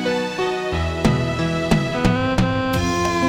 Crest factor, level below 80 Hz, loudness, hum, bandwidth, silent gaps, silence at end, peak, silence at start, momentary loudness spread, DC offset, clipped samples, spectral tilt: 16 dB; -32 dBFS; -20 LUFS; none; 17.5 kHz; none; 0 s; -2 dBFS; 0 s; 4 LU; under 0.1%; under 0.1%; -6 dB/octave